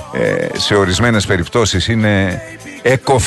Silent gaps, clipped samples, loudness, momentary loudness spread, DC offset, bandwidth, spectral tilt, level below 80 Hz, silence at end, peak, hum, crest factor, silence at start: none; under 0.1%; -14 LUFS; 6 LU; under 0.1%; 12.5 kHz; -4.5 dB/octave; -34 dBFS; 0 s; 0 dBFS; none; 14 dB; 0 s